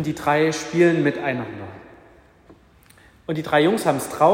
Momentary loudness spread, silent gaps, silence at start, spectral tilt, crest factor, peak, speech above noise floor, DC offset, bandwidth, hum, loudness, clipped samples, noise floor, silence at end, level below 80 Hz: 17 LU; none; 0 s; -5.5 dB/octave; 18 dB; -2 dBFS; 32 dB; under 0.1%; 16 kHz; none; -20 LUFS; under 0.1%; -52 dBFS; 0 s; -58 dBFS